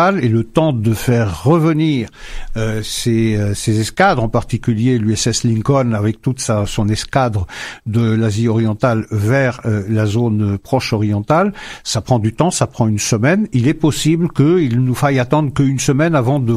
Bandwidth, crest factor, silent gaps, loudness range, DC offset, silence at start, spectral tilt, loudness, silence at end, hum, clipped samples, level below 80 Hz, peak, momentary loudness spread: 15 kHz; 14 dB; none; 2 LU; under 0.1%; 0 s; -6 dB/octave; -16 LUFS; 0 s; none; under 0.1%; -36 dBFS; 0 dBFS; 6 LU